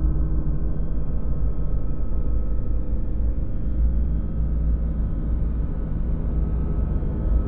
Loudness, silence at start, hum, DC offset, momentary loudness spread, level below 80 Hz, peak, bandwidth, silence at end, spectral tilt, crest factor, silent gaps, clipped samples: -27 LUFS; 0 s; none; under 0.1%; 4 LU; -22 dBFS; -10 dBFS; 1.9 kHz; 0 s; -13.5 dB/octave; 12 dB; none; under 0.1%